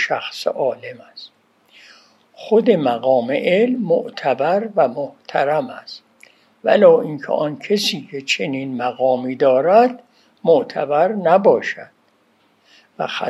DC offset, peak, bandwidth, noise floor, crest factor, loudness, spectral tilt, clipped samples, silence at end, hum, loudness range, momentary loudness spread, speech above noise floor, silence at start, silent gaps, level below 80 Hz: under 0.1%; 0 dBFS; 12.5 kHz; -59 dBFS; 18 dB; -17 LUFS; -5 dB/octave; under 0.1%; 0 s; none; 3 LU; 18 LU; 42 dB; 0 s; none; -76 dBFS